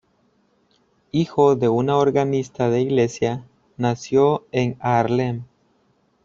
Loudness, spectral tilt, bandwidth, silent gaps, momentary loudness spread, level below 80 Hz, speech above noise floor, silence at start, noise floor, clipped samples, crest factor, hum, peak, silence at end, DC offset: -20 LUFS; -7 dB/octave; 7.6 kHz; none; 8 LU; -58 dBFS; 44 dB; 1.15 s; -63 dBFS; under 0.1%; 18 dB; none; -4 dBFS; 0.8 s; under 0.1%